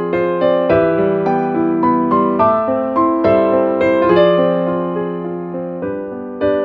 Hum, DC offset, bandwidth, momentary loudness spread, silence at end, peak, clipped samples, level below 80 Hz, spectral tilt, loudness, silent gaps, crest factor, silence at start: none; under 0.1%; 5.2 kHz; 11 LU; 0 s; 0 dBFS; under 0.1%; -46 dBFS; -9.5 dB/octave; -15 LUFS; none; 14 dB; 0 s